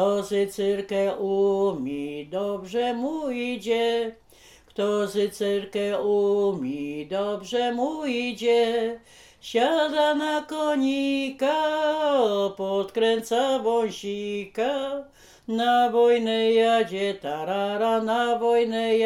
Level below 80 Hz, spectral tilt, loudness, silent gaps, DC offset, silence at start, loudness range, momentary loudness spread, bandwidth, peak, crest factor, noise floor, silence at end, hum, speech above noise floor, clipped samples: -64 dBFS; -4.5 dB/octave; -24 LUFS; none; under 0.1%; 0 s; 4 LU; 9 LU; 15.5 kHz; -10 dBFS; 14 dB; -53 dBFS; 0 s; none; 29 dB; under 0.1%